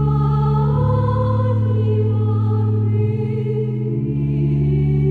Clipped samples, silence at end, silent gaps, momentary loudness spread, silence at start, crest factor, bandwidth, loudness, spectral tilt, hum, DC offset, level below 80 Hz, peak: under 0.1%; 0 s; none; 4 LU; 0 s; 10 dB; 4.5 kHz; -18 LUFS; -11.5 dB/octave; none; under 0.1%; -34 dBFS; -6 dBFS